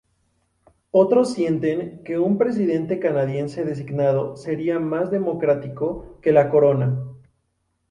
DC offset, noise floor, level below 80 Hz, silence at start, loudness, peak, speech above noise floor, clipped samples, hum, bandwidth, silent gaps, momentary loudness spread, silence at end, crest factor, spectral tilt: under 0.1%; -71 dBFS; -56 dBFS; 0.95 s; -21 LUFS; -2 dBFS; 51 dB; under 0.1%; none; 11 kHz; none; 10 LU; 0.75 s; 18 dB; -8.5 dB/octave